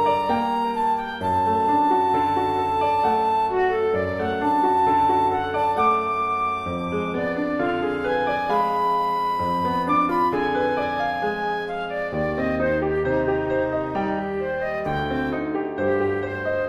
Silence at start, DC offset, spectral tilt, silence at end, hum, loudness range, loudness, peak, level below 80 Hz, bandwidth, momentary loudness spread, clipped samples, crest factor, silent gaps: 0 s; under 0.1%; -7 dB/octave; 0 s; none; 3 LU; -22 LUFS; -8 dBFS; -46 dBFS; 13.5 kHz; 6 LU; under 0.1%; 14 dB; none